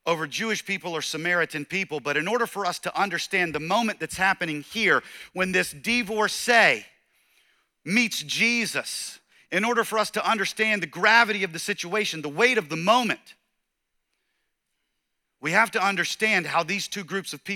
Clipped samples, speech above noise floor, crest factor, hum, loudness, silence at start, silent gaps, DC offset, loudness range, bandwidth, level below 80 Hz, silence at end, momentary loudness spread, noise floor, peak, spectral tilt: under 0.1%; 53 dB; 20 dB; none; -24 LUFS; 0.05 s; none; under 0.1%; 4 LU; 18.5 kHz; -66 dBFS; 0 s; 9 LU; -78 dBFS; -4 dBFS; -3 dB/octave